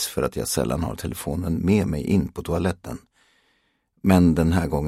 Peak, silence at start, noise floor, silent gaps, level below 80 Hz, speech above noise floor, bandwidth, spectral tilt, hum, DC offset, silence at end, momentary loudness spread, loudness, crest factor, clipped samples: -2 dBFS; 0 s; -68 dBFS; none; -38 dBFS; 46 dB; 15.5 kHz; -6 dB/octave; none; under 0.1%; 0 s; 11 LU; -23 LUFS; 20 dB; under 0.1%